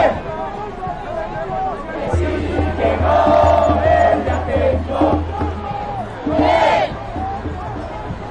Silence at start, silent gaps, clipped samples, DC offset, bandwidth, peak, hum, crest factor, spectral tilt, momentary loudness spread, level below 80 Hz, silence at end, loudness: 0 s; none; under 0.1%; under 0.1%; 9.2 kHz; -4 dBFS; none; 14 dB; -7.5 dB/octave; 13 LU; -32 dBFS; 0 s; -18 LUFS